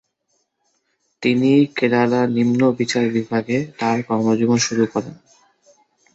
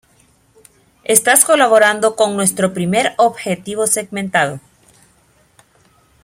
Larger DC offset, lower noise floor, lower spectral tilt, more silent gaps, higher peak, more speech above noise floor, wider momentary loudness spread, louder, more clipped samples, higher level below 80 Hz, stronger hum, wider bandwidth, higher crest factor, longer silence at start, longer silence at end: neither; first, -69 dBFS vs -54 dBFS; first, -5.5 dB/octave vs -2.5 dB/octave; neither; second, -4 dBFS vs 0 dBFS; first, 52 dB vs 40 dB; second, 6 LU vs 11 LU; second, -18 LUFS vs -14 LUFS; neither; about the same, -60 dBFS vs -58 dBFS; neither; second, 8 kHz vs 16.5 kHz; about the same, 16 dB vs 16 dB; about the same, 1.2 s vs 1.1 s; second, 1 s vs 1.65 s